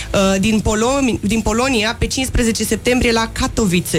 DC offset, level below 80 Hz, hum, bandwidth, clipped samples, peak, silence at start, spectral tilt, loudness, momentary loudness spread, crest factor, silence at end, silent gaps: under 0.1%; -28 dBFS; none; 16.5 kHz; under 0.1%; -2 dBFS; 0 s; -4 dB/octave; -16 LUFS; 3 LU; 14 dB; 0 s; none